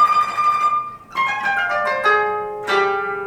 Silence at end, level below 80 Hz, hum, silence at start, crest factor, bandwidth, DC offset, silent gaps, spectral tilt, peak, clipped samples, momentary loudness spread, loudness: 0 s; -58 dBFS; none; 0 s; 14 dB; 14 kHz; under 0.1%; none; -3 dB/octave; -4 dBFS; under 0.1%; 6 LU; -18 LUFS